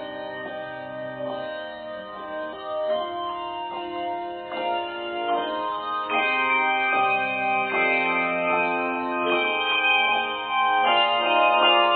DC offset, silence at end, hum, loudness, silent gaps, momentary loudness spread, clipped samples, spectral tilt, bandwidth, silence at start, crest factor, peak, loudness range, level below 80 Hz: under 0.1%; 0 s; none; -23 LUFS; none; 14 LU; under 0.1%; -6.5 dB/octave; 4.6 kHz; 0 s; 18 dB; -6 dBFS; 10 LU; -66 dBFS